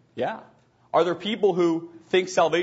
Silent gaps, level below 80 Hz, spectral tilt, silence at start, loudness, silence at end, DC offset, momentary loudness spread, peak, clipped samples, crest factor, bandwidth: none; -72 dBFS; -5 dB/octave; 0.15 s; -24 LUFS; 0 s; under 0.1%; 9 LU; -8 dBFS; under 0.1%; 16 dB; 8 kHz